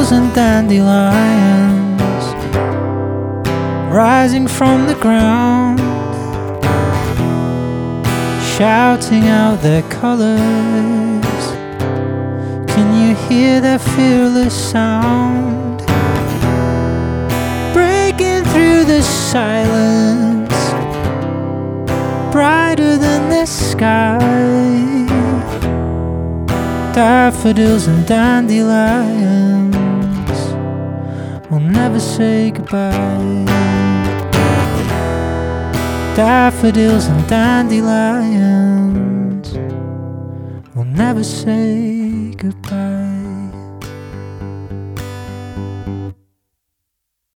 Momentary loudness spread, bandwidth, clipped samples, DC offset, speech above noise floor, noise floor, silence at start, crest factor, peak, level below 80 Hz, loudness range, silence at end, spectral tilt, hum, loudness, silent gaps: 11 LU; 19.5 kHz; under 0.1%; under 0.1%; 63 dB; -74 dBFS; 0 s; 14 dB; 0 dBFS; -34 dBFS; 6 LU; 1.2 s; -6 dB/octave; none; -14 LUFS; none